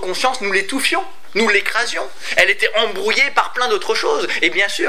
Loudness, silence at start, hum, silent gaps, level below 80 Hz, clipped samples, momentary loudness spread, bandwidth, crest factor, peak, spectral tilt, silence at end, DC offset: -16 LUFS; 0 s; none; none; -62 dBFS; under 0.1%; 5 LU; 16 kHz; 18 dB; 0 dBFS; -1.5 dB/octave; 0 s; 5%